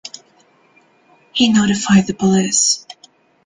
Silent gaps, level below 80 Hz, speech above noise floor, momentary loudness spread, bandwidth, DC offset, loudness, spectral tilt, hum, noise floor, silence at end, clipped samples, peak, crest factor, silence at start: none; -50 dBFS; 40 dB; 9 LU; 9.8 kHz; under 0.1%; -15 LUFS; -3.5 dB/octave; none; -54 dBFS; 0.55 s; under 0.1%; -2 dBFS; 16 dB; 0.05 s